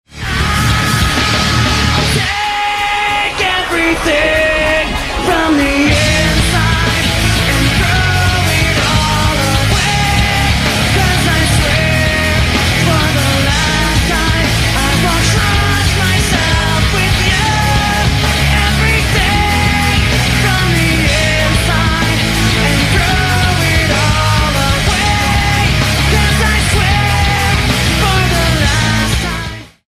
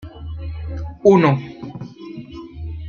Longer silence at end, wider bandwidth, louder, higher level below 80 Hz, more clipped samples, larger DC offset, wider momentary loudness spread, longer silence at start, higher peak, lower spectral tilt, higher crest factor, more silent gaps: first, 0.25 s vs 0 s; first, 15.5 kHz vs 7 kHz; first, -11 LUFS vs -18 LUFS; first, -20 dBFS vs -38 dBFS; neither; neither; second, 2 LU vs 21 LU; about the same, 0.1 s vs 0 s; about the same, 0 dBFS vs -2 dBFS; second, -4 dB/octave vs -8.5 dB/octave; second, 12 dB vs 18 dB; neither